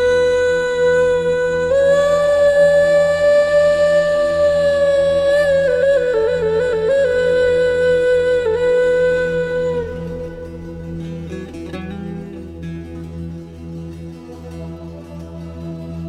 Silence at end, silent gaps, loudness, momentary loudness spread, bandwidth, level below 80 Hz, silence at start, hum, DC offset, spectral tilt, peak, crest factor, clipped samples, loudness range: 0 s; none; -15 LUFS; 18 LU; 11 kHz; -40 dBFS; 0 s; none; under 0.1%; -5.5 dB/octave; -4 dBFS; 12 dB; under 0.1%; 16 LU